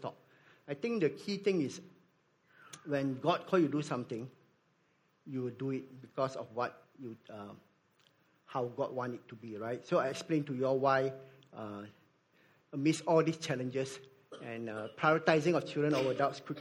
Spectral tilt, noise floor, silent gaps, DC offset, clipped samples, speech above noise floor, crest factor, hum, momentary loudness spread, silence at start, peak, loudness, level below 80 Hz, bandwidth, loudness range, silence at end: -6 dB/octave; -73 dBFS; none; under 0.1%; under 0.1%; 39 dB; 24 dB; none; 19 LU; 0 s; -12 dBFS; -34 LUFS; -80 dBFS; 16 kHz; 8 LU; 0 s